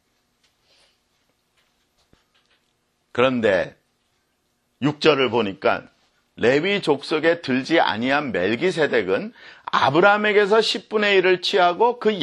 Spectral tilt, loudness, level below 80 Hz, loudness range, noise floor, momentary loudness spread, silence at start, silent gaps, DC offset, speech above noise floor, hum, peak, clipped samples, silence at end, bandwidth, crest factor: -5 dB/octave; -19 LUFS; -64 dBFS; 8 LU; -69 dBFS; 8 LU; 3.15 s; none; under 0.1%; 50 dB; none; -2 dBFS; under 0.1%; 0 s; 11 kHz; 20 dB